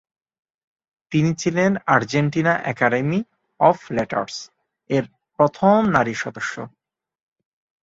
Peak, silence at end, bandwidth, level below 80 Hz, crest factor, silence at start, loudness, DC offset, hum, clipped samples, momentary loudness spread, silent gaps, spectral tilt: -2 dBFS; 1.15 s; 7.8 kHz; -58 dBFS; 20 dB; 1.1 s; -20 LUFS; under 0.1%; none; under 0.1%; 13 LU; none; -6 dB/octave